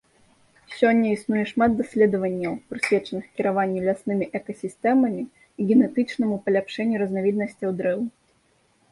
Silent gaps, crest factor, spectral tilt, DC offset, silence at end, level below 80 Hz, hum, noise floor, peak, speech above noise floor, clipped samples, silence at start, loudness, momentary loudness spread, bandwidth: none; 18 dB; -7 dB/octave; under 0.1%; 0.8 s; -60 dBFS; none; -64 dBFS; -6 dBFS; 41 dB; under 0.1%; 0.7 s; -23 LUFS; 10 LU; 11.5 kHz